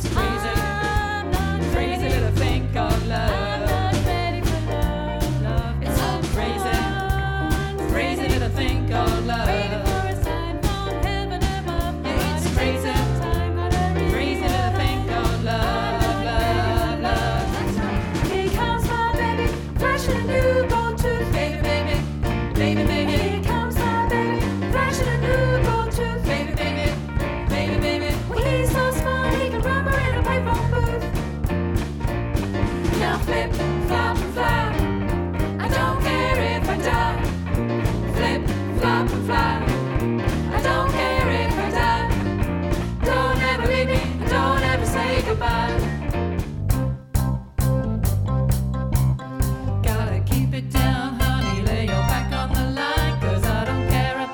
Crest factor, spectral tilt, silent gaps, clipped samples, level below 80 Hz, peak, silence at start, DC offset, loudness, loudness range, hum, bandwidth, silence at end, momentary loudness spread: 16 dB; -6 dB/octave; none; under 0.1%; -28 dBFS; -4 dBFS; 0 s; 0.1%; -22 LUFS; 2 LU; none; over 20 kHz; 0 s; 4 LU